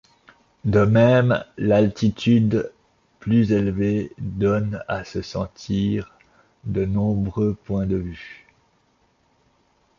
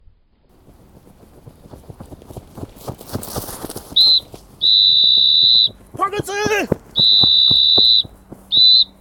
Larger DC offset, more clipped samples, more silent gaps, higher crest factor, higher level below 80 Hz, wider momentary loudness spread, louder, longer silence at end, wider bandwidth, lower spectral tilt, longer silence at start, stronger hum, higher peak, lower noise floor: neither; neither; neither; about the same, 18 dB vs 16 dB; about the same, -44 dBFS vs -46 dBFS; second, 13 LU vs 20 LU; second, -21 LUFS vs -11 LUFS; first, 1.65 s vs 0.15 s; second, 7.2 kHz vs 19 kHz; first, -8 dB/octave vs -2.5 dB/octave; second, 0.65 s vs 2 s; neither; second, -4 dBFS vs 0 dBFS; first, -63 dBFS vs -54 dBFS